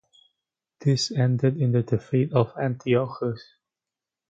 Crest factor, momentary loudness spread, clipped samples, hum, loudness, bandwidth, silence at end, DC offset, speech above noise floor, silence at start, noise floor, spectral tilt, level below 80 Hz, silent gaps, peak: 20 dB; 7 LU; under 0.1%; none; -24 LUFS; 8 kHz; 0.9 s; under 0.1%; 66 dB; 0.8 s; -89 dBFS; -6.5 dB/octave; -60 dBFS; none; -6 dBFS